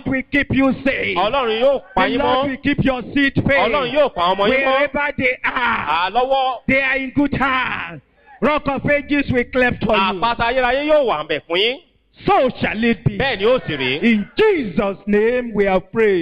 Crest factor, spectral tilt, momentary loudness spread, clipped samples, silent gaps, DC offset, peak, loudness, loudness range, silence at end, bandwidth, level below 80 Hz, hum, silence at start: 12 dB; -7.5 dB/octave; 4 LU; under 0.1%; none; under 0.1%; -6 dBFS; -17 LUFS; 2 LU; 0 s; 8.2 kHz; -40 dBFS; none; 0.05 s